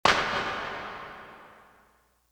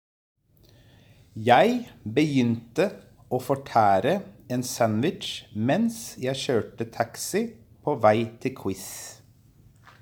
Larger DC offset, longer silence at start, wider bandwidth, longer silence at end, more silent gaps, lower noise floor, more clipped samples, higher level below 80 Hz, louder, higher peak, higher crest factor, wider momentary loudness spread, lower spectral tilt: neither; second, 0.05 s vs 1.35 s; about the same, over 20 kHz vs over 20 kHz; about the same, 0.8 s vs 0.9 s; neither; first, -65 dBFS vs -57 dBFS; neither; first, -56 dBFS vs -62 dBFS; second, -30 LUFS vs -25 LUFS; about the same, -6 dBFS vs -4 dBFS; about the same, 24 dB vs 22 dB; first, 22 LU vs 13 LU; second, -2.5 dB/octave vs -5.5 dB/octave